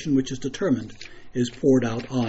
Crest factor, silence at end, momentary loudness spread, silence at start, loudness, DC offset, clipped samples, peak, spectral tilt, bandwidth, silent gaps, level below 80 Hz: 16 dB; 0 s; 14 LU; 0 s; -24 LUFS; under 0.1%; under 0.1%; -8 dBFS; -6.5 dB/octave; 8 kHz; none; -50 dBFS